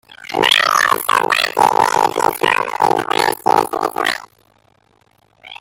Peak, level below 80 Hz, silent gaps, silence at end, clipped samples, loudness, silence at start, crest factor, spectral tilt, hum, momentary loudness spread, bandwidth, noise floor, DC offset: 0 dBFS; -58 dBFS; none; 0.05 s; under 0.1%; -15 LUFS; 0.1 s; 16 dB; -2 dB/octave; none; 7 LU; 17 kHz; -56 dBFS; under 0.1%